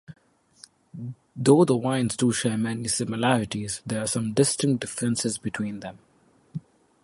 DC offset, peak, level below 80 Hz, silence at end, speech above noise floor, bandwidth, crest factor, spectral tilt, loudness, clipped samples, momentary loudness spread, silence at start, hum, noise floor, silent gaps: under 0.1%; -4 dBFS; -60 dBFS; 0.45 s; 35 dB; 11.5 kHz; 22 dB; -5 dB/octave; -24 LUFS; under 0.1%; 20 LU; 0.1 s; none; -59 dBFS; none